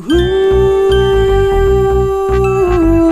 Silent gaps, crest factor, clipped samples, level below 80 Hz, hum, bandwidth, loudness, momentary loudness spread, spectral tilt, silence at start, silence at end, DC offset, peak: none; 10 dB; under 0.1%; -20 dBFS; none; 13.5 kHz; -11 LUFS; 2 LU; -7 dB/octave; 0 s; 0 s; under 0.1%; 0 dBFS